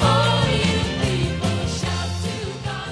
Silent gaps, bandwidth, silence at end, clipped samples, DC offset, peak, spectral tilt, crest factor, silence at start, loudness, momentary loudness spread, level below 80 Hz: none; 11 kHz; 0 s; under 0.1%; under 0.1%; -6 dBFS; -5 dB/octave; 16 dB; 0 s; -22 LUFS; 10 LU; -36 dBFS